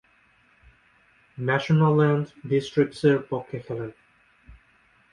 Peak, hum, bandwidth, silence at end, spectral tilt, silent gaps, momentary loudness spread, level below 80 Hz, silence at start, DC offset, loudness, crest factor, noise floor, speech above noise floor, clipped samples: -6 dBFS; none; 10.5 kHz; 0.6 s; -8 dB/octave; none; 14 LU; -60 dBFS; 1.4 s; under 0.1%; -24 LUFS; 20 dB; -61 dBFS; 38 dB; under 0.1%